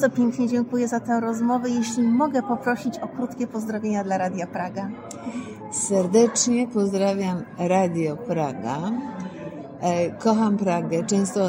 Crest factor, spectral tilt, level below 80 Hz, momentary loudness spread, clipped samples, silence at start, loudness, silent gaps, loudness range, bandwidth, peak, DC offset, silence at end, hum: 16 dB; -5 dB/octave; -66 dBFS; 12 LU; under 0.1%; 0 s; -24 LUFS; none; 4 LU; 16 kHz; -6 dBFS; under 0.1%; 0 s; none